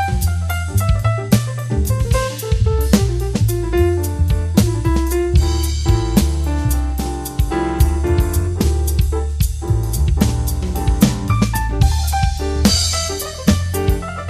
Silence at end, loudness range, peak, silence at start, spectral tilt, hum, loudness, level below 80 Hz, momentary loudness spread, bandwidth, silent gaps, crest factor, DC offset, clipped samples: 0 s; 1 LU; 0 dBFS; 0 s; -5.5 dB/octave; none; -18 LUFS; -20 dBFS; 5 LU; 14 kHz; none; 16 dB; under 0.1%; under 0.1%